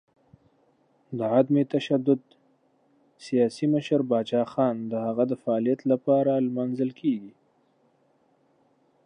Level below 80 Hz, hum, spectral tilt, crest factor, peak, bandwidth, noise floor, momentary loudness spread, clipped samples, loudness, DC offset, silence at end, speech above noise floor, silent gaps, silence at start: -78 dBFS; none; -8 dB/octave; 18 dB; -8 dBFS; 10 kHz; -66 dBFS; 7 LU; under 0.1%; -25 LUFS; under 0.1%; 1.75 s; 41 dB; none; 1.1 s